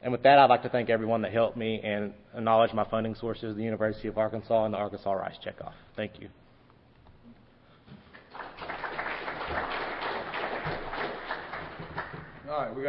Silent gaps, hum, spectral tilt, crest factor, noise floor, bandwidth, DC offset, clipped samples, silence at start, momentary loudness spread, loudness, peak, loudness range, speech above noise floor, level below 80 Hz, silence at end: none; none; -9.5 dB/octave; 24 dB; -58 dBFS; 5.6 kHz; under 0.1%; under 0.1%; 0 s; 15 LU; -29 LUFS; -6 dBFS; 13 LU; 31 dB; -54 dBFS; 0 s